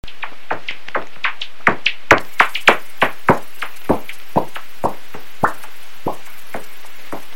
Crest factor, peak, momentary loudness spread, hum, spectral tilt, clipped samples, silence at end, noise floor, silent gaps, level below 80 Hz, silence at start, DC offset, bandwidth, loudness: 22 dB; 0 dBFS; 20 LU; none; -4 dB/octave; under 0.1%; 0.15 s; -40 dBFS; none; -46 dBFS; 0.05 s; 10%; 16.5 kHz; -19 LUFS